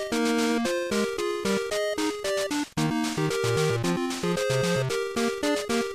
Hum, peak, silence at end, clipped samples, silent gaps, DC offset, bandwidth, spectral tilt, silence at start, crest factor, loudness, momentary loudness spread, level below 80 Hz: none; -14 dBFS; 0 s; under 0.1%; none; under 0.1%; 15.5 kHz; -4.5 dB/octave; 0 s; 12 dB; -26 LUFS; 3 LU; -56 dBFS